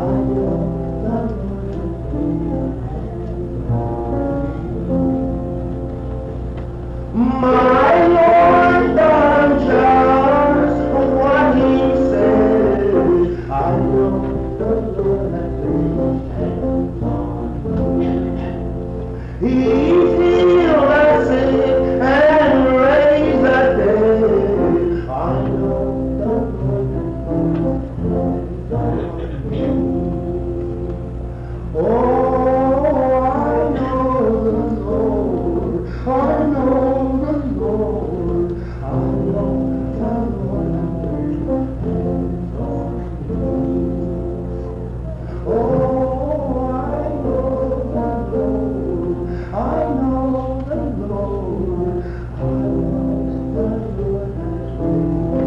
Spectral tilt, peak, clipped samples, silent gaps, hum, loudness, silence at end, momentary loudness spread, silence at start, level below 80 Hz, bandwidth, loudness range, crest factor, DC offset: -9 dB/octave; -6 dBFS; under 0.1%; none; none; -17 LUFS; 0 s; 12 LU; 0 s; -28 dBFS; 7.4 kHz; 9 LU; 12 dB; under 0.1%